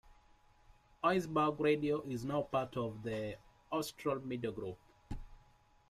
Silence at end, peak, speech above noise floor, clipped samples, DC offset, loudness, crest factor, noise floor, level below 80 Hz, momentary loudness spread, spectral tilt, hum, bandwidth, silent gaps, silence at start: 0.55 s; -18 dBFS; 30 dB; under 0.1%; under 0.1%; -37 LUFS; 20 dB; -67 dBFS; -60 dBFS; 18 LU; -6 dB/octave; none; 15 kHz; none; 0.05 s